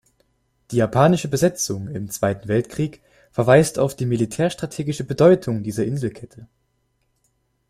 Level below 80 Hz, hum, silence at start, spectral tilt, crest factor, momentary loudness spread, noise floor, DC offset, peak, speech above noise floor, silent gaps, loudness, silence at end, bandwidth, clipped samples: -52 dBFS; none; 0.7 s; -6 dB/octave; 20 dB; 12 LU; -68 dBFS; under 0.1%; -2 dBFS; 49 dB; none; -20 LUFS; 1.25 s; 15.5 kHz; under 0.1%